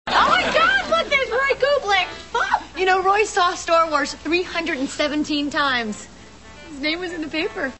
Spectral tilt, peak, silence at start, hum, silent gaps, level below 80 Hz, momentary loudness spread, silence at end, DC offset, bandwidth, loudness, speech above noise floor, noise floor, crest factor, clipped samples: -2.5 dB/octave; -4 dBFS; 0.05 s; none; none; -48 dBFS; 8 LU; 0.05 s; 0.3%; 8.4 kHz; -20 LUFS; 21 dB; -43 dBFS; 16 dB; under 0.1%